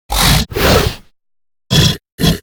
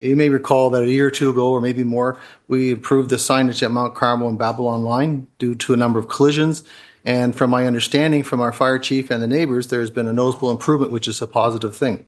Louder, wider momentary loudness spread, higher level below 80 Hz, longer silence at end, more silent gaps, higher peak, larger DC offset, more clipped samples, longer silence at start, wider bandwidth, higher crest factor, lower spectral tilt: first, -13 LUFS vs -18 LUFS; about the same, 6 LU vs 6 LU; first, -22 dBFS vs -62 dBFS; about the same, 0 s vs 0.1 s; first, 2.12-2.18 s vs none; about the same, 0 dBFS vs 0 dBFS; neither; neither; about the same, 0.1 s vs 0 s; first, over 20 kHz vs 12.5 kHz; about the same, 14 dB vs 18 dB; second, -4 dB/octave vs -5.5 dB/octave